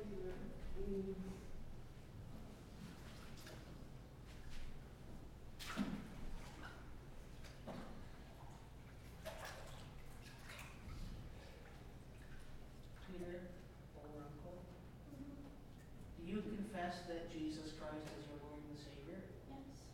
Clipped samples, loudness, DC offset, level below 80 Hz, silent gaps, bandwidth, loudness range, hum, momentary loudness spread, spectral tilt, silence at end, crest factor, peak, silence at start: under 0.1%; -53 LUFS; under 0.1%; -56 dBFS; none; 16.5 kHz; 8 LU; none; 12 LU; -6 dB/octave; 0 s; 20 dB; -30 dBFS; 0 s